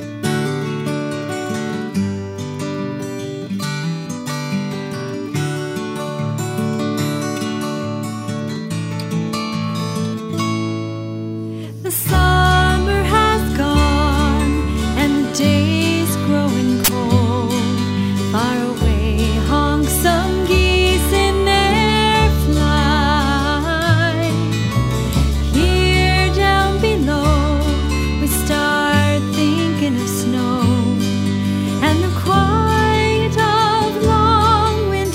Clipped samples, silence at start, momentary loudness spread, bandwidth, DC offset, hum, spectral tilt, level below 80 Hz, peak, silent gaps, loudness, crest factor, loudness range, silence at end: under 0.1%; 0 s; 10 LU; 16 kHz; under 0.1%; none; -5 dB/octave; -24 dBFS; 0 dBFS; none; -17 LUFS; 16 dB; 8 LU; 0 s